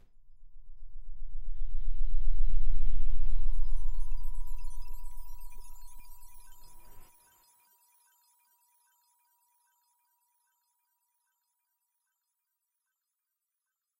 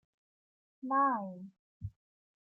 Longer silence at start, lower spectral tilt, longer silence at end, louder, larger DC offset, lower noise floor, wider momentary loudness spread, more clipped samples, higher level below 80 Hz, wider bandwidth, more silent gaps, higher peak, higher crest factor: second, 0.45 s vs 0.85 s; second, -6 dB/octave vs -11 dB/octave; first, 7.35 s vs 0.5 s; second, -40 LUFS vs -32 LUFS; neither; about the same, -88 dBFS vs under -90 dBFS; about the same, 22 LU vs 20 LU; neither; first, -32 dBFS vs -66 dBFS; second, 1 kHz vs 2.6 kHz; second, none vs 1.59-1.80 s; first, -10 dBFS vs -20 dBFS; second, 12 dB vs 18 dB